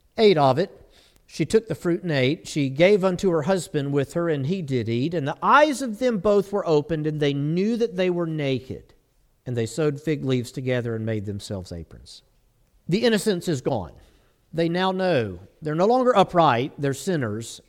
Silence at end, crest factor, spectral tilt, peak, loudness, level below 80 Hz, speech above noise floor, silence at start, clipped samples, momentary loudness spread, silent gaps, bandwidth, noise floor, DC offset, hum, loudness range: 0.1 s; 18 dB; -6 dB/octave; -4 dBFS; -23 LUFS; -54 dBFS; 40 dB; 0.15 s; under 0.1%; 13 LU; none; 16 kHz; -63 dBFS; under 0.1%; none; 6 LU